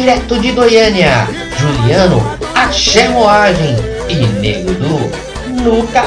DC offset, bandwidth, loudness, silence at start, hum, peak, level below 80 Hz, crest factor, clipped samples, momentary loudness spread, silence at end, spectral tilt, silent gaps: under 0.1%; 10.5 kHz; -11 LUFS; 0 s; none; 0 dBFS; -26 dBFS; 10 dB; under 0.1%; 9 LU; 0 s; -5 dB/octave; none